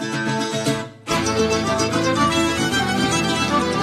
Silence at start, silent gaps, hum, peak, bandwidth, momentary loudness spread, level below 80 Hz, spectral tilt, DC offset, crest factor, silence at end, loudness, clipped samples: 0 s; none; none; -6 dBFS; 14 kHz; 5 LU; -44 dBFS; -4 dB/octave; under 0.1%; 14 dB; 0 s; -20 LUFS; under 0.1%